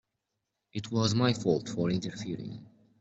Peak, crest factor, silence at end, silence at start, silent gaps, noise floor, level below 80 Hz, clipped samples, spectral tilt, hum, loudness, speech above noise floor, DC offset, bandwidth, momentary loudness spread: -12 dBFS; 18 dB; 0.35 s; 0.75 s; none; -84 dBFS; -64 dBFS; under 0.1%; -6 dB/octave; none; -31 LUFS; 54 dB; under 0.1%; 8.2 kHz; 15 LU